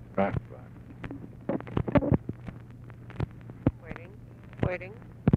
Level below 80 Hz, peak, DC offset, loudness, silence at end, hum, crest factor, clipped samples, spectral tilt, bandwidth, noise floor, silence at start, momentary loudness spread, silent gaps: -46 dBFS; -8 dBFS; under 0.1%; -32 LUFS; 0 s; none; 24 dB; under 0.1%; -10 dB/octave; 5.2 kHz; -47 dBFS; 0 s; 20 LU; none